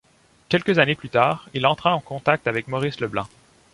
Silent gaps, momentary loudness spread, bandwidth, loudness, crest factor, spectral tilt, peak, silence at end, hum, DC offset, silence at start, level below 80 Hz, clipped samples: none; 8 LU; 11.5 kHz; -22 LUFS; 20 dB; -6 dB/octave; -2 dBFS; 0.45 s; none; under 0.1%; 0.5 s; -56 dBFS; under 0.1%